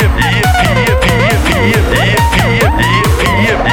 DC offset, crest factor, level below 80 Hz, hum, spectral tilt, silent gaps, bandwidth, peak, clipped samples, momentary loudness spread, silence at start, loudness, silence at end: under 0.1%; 10 dB; -18 dBFS; none; -5 dB/octave; none; 19 kHz; 0 dBFS; under 0.1%; 1 LU; 0 s; -10 LUFS; 0 s